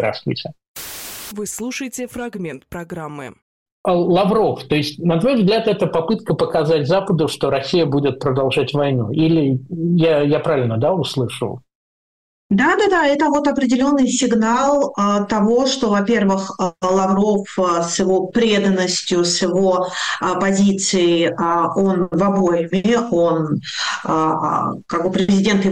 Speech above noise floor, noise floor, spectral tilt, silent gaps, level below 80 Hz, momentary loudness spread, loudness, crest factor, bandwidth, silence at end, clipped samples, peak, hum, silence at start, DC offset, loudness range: over 73 dB; under -90 dBFS; -5 dB/octave; 0.68-0.75 s, 3.42-3.66 s, 3.72-3.84 s, 11.75-12.50 s; -50 dBFS; 11 LU; -17 LUFS; 10 dB; 16 kHz; 0 s; under 0.1%; -8 dBFS; none; 0 s; under 0.1%; 4 LU